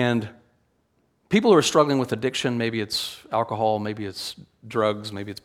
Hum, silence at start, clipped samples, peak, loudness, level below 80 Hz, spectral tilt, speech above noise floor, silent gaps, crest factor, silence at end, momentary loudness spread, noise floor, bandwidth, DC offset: none; 0 s; under 0.1%; -4 dBFS; -23 LUFS; -64 dBFS; -4.5 dB/octave; 44 dB; none; 20 dB; 0.1 s; 15 LU; -68 dBFS; 16.5 kHz; under 0.1%